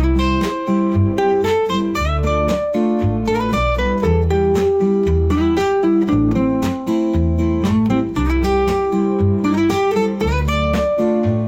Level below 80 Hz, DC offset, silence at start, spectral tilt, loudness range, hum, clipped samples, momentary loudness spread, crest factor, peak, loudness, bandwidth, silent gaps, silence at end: -26 dBFS; 0.2%; 0 s; -7.5 dB/octave; 1 LU; none; under 0.1%; 3 LU; 10 dB; -6 dBFS; -17 LUFS; 16.5 kHz; none; 0 s